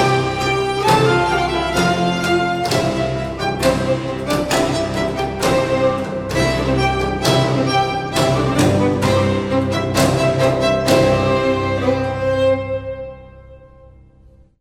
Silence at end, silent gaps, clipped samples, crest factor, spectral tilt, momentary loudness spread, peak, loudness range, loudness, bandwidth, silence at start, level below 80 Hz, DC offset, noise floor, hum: 0.95 s; none; under 0.1%; 16 dB; -5.5 dB/octave; 6 LU; -2 dBFS; 3 LU; -17 LUFS; 16.5 kHz; 0 s; -36 dBFS; under 0.1%; -47 dBFS; none